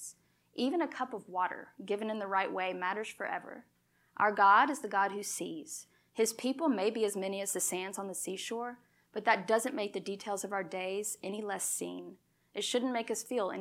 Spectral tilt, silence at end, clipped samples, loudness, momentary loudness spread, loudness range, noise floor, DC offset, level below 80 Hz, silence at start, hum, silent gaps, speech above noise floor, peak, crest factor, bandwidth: -2.5 dB/octave; 0 s; under 0.1%; -33 LUFS; 14 LU; 5 LU; -57 dBFS; under 0.1%; -88 dBFS; 0 s; none; none; 23 dB; -12 dBFS; 22 dB; 16.5 kHz